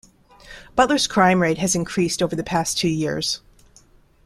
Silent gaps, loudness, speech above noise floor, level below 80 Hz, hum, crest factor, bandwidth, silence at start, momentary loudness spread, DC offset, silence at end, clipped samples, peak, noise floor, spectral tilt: none; -20 LUFS; 33 dB; -50 dBFS; none; 20 dB; 14.5 kHz; 0.45 s; 8 LU; under 0.1%; 0.9 s; under 0.1%; -2 dBFS; -53 dBFS; -4 dB/octave